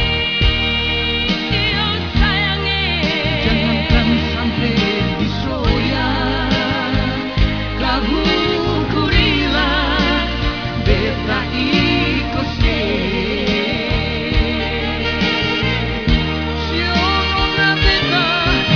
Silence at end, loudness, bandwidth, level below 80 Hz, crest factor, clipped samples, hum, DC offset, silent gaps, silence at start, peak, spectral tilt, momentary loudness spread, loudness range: 0 s; -16 LUFS; 5.4 kHz; -24 dBFS; 16 dB; under 0.1%; none; 0.4%; none; 0 s; 0 dBFS; -6 dB/octave; 5 LU; 2 LU